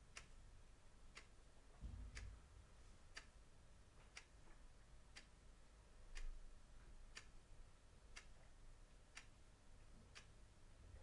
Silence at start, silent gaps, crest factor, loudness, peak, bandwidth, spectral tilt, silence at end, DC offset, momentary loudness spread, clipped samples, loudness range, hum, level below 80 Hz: 0 s; none; 22 dB; -64 LUFS; -40 dBFS; 11 kHz; -3.5 dB/octave; 0 s; under 0.1%; 10 LU; under 0.1%; 3 LU; none; -62 dBFS